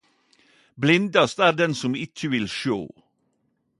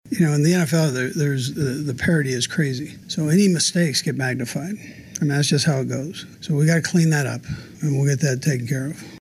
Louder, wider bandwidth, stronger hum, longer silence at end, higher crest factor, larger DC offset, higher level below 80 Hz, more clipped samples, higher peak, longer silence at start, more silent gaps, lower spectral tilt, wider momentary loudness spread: about the same, -22 LUFS vs -21 LUFS; second, 11.5 kHz vs 15.5 kHz; neither; first, 0.9 s vs 0.05 s; first, 22 dB vs 12 dB; neither; second, -62 dBFS vs -54 dBFS; neither; first, -4 dBFS vs -8 dBFS; first, 0.75 s vs 0.05 s; neither; about the same, -5 dB/octave vs -5 dB/octave; about the same, 10 LU vs 11 LU